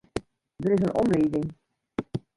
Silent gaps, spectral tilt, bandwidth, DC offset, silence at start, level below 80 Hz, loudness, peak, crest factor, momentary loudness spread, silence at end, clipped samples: none; -8 dB/octave; 11.5 kHz; under 0.1%; 0.15 s; -52 dBFS; -27 LUFS; -12 dBFS; 16 dB; 13 LU; 0.2 s; under 0.1%